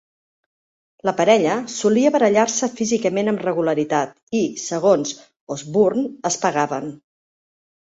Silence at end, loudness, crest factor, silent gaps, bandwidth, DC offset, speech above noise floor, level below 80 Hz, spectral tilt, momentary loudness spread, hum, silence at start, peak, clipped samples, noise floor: 1 s; -19 LUFS; 18 dB; 4.23-4.27 s, 5.36-5.47 s; 8.2 kHz; under 0.1%; over 71 dB; -64 dBFS; -4.5 dB/octave; 10 LU; none; 1.05 s; -2 dBFS; under 0.1%; under -90 dBFS